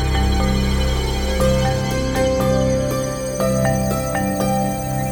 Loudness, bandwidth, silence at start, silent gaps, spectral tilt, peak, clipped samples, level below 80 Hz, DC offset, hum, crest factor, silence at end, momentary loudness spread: -19 LUFS; over 20 kHz; 0 s; none; -5.5 dB/octave; -6 dBFS; under 0.1%; -24 dBFS; under 0.1%; none; 12 dB; 0 s; 4 LU